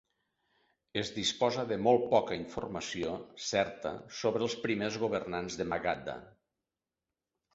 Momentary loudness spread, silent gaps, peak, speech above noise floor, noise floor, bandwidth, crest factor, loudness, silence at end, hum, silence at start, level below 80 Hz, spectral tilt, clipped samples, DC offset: 11 LU; none; -14 dBFS; over 57 dB; under -90 dBFS; 8 kHz; 22 dB; -33 LUFS; 1.25 s; none; 0.95 s; -64 dBFS; -4 dB/octave; under 0.1%; under 0.1%